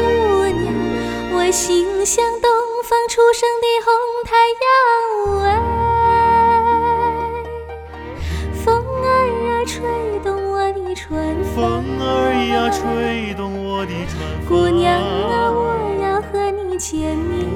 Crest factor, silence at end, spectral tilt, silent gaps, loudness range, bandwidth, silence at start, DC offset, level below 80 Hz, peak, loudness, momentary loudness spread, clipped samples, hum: 16 dB; 0 s; -4.5 dB/octave; none; 5 LU; 18 kHz; 0 s; under 0.1%; -32 dBFS; -2 dBFS; -17 LUFS; 11 LU; under 0.1%; none